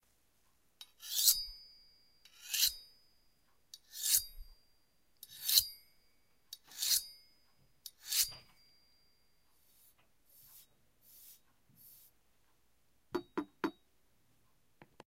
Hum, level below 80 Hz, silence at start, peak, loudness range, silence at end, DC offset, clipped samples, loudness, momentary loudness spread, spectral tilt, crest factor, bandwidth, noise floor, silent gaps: none; -66 dBFS; 0.8 s; -10 dBFS; 13 LU; 1.45 s; under 0.1%; under 0.1%; -33 LUFS; 25 LU; 0.5 dB/octave; 32 dB; 16 kHz; -77 dBFS; none